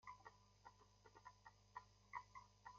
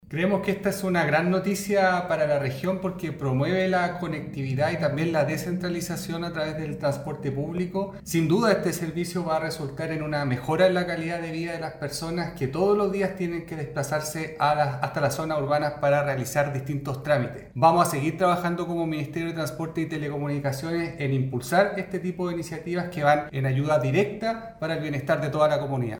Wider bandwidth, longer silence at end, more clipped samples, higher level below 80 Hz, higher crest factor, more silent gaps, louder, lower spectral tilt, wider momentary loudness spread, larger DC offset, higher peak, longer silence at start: second, 7.2 kHz vs over 20 kHz; about the same, 0 s vs 0 s; neither; second, -80 dBFS vs -54 dBFS; about the same, 24 dB vs 20 dB; neither; second, -62 LUFS vs -26 LUFS; second, -2 dB/octave vs -6 dB/octave; first, 11 LU vs 8 LU; neither; second, -38 dBFS vs -6 dBFS; about the same, 0 s vs 0.05 s